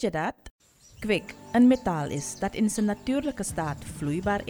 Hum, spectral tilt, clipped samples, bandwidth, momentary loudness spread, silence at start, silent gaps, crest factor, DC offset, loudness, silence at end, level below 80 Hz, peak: none; -5.5 dB/octave; under 0.1%; 19 kHz; 12 LU; 0 s; 0.51-0.59 s; 16 dB; under 0.1%; -27 LUFS; 0 s; -50 dBFS; -10 dBFS